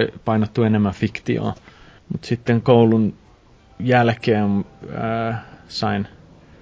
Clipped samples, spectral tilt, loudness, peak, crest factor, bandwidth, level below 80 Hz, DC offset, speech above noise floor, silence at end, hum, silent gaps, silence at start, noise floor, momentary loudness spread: under 0.1%; -8 dB/octave; -20 LUFS; -2 dBFS; 18 dB; 7.8 kHz; -48 dBFS; under 0.1%; 31 dB; 0.55 s; none; none; 0 s; -50 dBFS; 16 LU